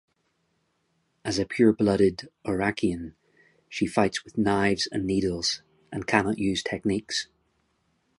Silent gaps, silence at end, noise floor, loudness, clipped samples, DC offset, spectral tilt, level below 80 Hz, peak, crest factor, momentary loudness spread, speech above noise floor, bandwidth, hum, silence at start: none; 0.95 s; -73 dBFS; -26 LUFS; under 0.1%; under 0.1%; -5 dB/octave; -52 dBFS; -2 dBFS; 24 dB; 14 LU; 47 dB; 11.5 kHz; none; 1.25 s